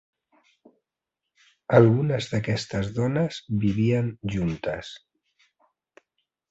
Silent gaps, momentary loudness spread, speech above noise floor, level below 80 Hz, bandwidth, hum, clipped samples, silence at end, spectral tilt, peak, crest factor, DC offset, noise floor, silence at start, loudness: none; 15 LU; 62 dB; -52 dBFS; 8 kHz; none; under 0.1%; 1.55 s; -7.5 dB/octave; -2 dBFS; 24 dB; under 0.1%; -86 dBFS; 1.7 s; -24 LUFS